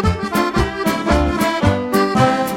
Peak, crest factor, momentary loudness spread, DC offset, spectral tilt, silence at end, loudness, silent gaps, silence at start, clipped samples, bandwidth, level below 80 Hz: -2 dBFS; 14 dB; 4 LU; under 0.1%; -6 dB/octave; 0 s; -17 LUFS; none; 0 s; under 0.1%; 17 kHz; -28 dBFS